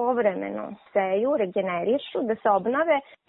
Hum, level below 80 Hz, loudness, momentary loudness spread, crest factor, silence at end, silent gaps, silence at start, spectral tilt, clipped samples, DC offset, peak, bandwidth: none; -70 dBFS; -25 LUFS; 6 LU; 16 dB; 0.25 s; none; 0 s; -10 dB/octave; under 0.1%; under 0.1%; -10 dBFS; 4.1 kHz